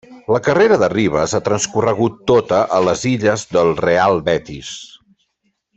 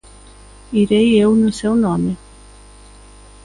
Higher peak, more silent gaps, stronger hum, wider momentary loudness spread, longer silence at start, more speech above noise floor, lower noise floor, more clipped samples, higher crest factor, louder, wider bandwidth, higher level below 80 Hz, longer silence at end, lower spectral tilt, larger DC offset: about the same, -2 dBFS vs -4 dBFS; neither; second, none vs 50 Hz at -40 dBFS; second, 7 LU vs 10 LU; second, 0.1 s vs 0.7 s; first, 52 dB vs 27 dB; first, -68 dBFS vs -42 dBFS; neither; about the same, 16 dB vs 14 dB; about the same, -16 LUFS vs -15 LUFS; second, 8.2 kHz vs 11 kHz; second, -48 dBFS vs -42 dBFS; second, 0.9 s vs 1.3 s; second, -5 dB/octave vs -6.5 dB/octave; neither